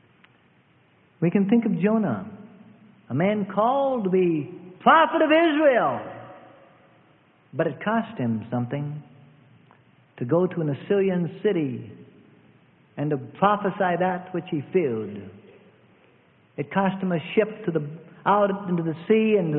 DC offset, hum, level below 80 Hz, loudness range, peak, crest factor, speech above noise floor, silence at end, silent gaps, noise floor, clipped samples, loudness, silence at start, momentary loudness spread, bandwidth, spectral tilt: under 0.1%; none; -68 dBFS; 8 LU; -4 dBFS; 20 dB; 37 dB; 0 s; none; -60 dBFS; under 0.1%; -23 LUFS; 1.2 s; 17 LU; 4 kHz; -11.5 dB/octave